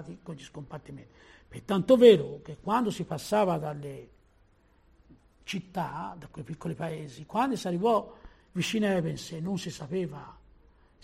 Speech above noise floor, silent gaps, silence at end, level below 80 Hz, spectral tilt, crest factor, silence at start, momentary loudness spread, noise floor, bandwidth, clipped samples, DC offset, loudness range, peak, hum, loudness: 35 dB; none; 0.7 s; -60 dBFS; -6 dB/octave; 24 dB; 0 s; 20 LU; -63 dBFS; 14 kHz; under 0.1%; under 0.1%; 13 LU; -6 dBFS; none; -28 LUFS